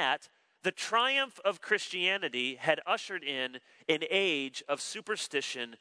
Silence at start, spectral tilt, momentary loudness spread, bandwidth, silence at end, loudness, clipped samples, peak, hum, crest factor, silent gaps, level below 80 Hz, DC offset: 0 s; -2 dB/octave; 8 LU; 11 kHz; 0.05 s; -31 LUFS; under 0.1%; -12 dBFS; none; 22 dB; none; under -90 dBFS; under 0.1%